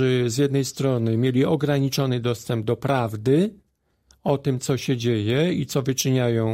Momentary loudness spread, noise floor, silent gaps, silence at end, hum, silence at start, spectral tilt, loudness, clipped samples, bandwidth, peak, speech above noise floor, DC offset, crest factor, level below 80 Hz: 4 LU; -62 dBFS; none; 0 s; none; 0 s; -6 dB/octave; -23 LUFS; under 0.1%; 16 kHz; -8 dBFS; 41 dB; under 0.1%; 14 dB; -56 dBFS